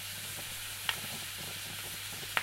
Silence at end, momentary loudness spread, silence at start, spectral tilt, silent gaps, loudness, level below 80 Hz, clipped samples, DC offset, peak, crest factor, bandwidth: 0 s; 4 LU; 0 s; -1 dB/octave; none; -37 LUFS; -64 dBFS; under 0.1%; under 0.1%; -8 dBFS; 32 dB; 16 kHz